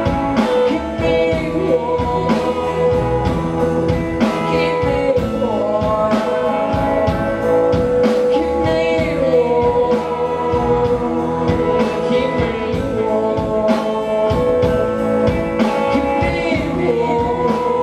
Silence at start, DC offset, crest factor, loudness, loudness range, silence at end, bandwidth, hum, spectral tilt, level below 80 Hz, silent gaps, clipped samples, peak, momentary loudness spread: 0 s; under 0.1%; 12 dB; -17 LUFS; 2 LU; 0 s; 12 kHz; none; -7 dB/octave; -34 dBFS; none; under 0.1%; -4 dBFS; 3 LU